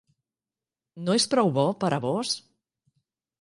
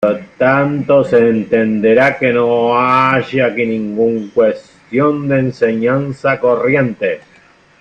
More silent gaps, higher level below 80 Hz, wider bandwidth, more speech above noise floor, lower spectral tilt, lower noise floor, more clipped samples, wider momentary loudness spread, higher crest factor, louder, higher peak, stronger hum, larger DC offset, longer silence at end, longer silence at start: neither; second, -70 dBFS vs -52 dBFS; first, 11.5 kHz vs 8.2 kHz; first, over 65 dB vs 34 dB; second, -4.5 dB/octave vs -8 dB/octave; first, under -90 dBFS vs -47 dBFS; neither; first, 9 LU vs 6 LU; first, 18 dB vs 12 dB; second, -25 LUFS vs -13 LUFS; second, -10 dBFS vs 0 dBFS; neither; neither; first, 1 s vs 0.6 s; first, 0.95 s vs 0 s